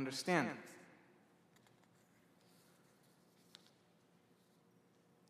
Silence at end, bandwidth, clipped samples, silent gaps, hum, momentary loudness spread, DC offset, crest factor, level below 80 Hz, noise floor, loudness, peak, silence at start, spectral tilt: 4.45 s; 15 kHz; under 0.1%; none; none; 27 LU; under 0.1%; 28 dB; under -90 dBFS; -72 dBFS; -39 LUFS; -20 dBFS; 0 s; -4.5 dB/octave